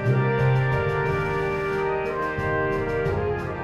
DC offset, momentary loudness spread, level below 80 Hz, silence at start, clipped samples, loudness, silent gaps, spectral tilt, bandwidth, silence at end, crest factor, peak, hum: under 0.1%; 5 LU; -42 dBFS; 0 s; under 0.1%; -24 LUFS; none; -8 dB/octave; 7.6 kHz; 0 s; 14 dB; -10 dBFS; none